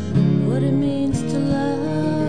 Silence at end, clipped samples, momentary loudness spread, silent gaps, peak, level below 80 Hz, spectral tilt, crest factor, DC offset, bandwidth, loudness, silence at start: 0 s; under 0.1%; 4 LU; none; -8 dBFS; -44 dBFS; -8 dB/octave; 12 dB; 1%; 10 kHz; -20 LUFS; 0 s